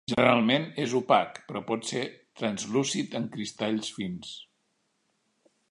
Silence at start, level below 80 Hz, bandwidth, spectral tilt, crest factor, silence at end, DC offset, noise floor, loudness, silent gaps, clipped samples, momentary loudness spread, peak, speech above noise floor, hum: 0.1 s; -68 dBFS; 11 kHz; -4.5 dB/octave; 26 dB; 1.25 s; under 0.1%; -74 dBFS; -28 LUFS; none; under 0.1%; 14 LU; -4 dBFS; 47 dB; none